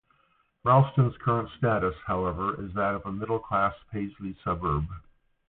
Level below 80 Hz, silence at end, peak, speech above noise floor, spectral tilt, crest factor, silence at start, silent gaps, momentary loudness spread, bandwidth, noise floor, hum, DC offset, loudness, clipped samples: -46 dBFS; 0.5 s; -8 dBFS; 41 dB; -12 dB/octave; 20 dB; 0.65 s; none; 13 LU; 4.1 kHz; -68 dBFS; none; under 0.1%; -28 LUFS; under 0.1%